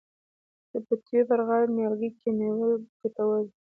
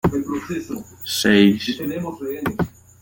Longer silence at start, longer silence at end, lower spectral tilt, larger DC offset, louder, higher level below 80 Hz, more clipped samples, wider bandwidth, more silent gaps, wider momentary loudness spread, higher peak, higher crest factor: first, 0.75 s vs 0.05 s; about the same, 0.2 s vs 0.3 s; first, -11 dB/octave vs -5 dB/octave; neither; second, -27 LUFS vs -21 LUFS; second, -74 dBFS vs -48 dBFS; neither; second, 2.9 kHz vs 17 kHz; first, 2.89-3.00 s vs none; second, 8 LU vs 14 LU; second, -12 dBFS vs -2 dBFS; second, 14 dB vs 20 dB